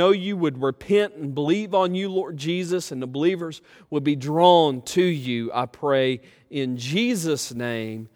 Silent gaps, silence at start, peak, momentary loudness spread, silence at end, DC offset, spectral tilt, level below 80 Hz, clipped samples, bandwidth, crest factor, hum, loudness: none; 0 s; -2 dBFS; 11 LU; 0.1 s; under 0.1%; -5.5 dB/octave; -64 dBFS; under 0.1%; 17 kHz; 20 dB; none; -23 LUFS